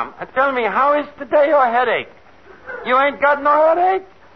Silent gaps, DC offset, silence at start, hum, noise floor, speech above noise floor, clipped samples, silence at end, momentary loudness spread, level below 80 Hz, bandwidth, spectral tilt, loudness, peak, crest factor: none; 0.4%; 0 s; none; -38 dBFS; 22 dB; under 0.1%; 0.3 s; 10 LU; -58 dBFS; 6 kHz; -6 dB/octave; -16 LUFS; -4 dBFS; 12 dB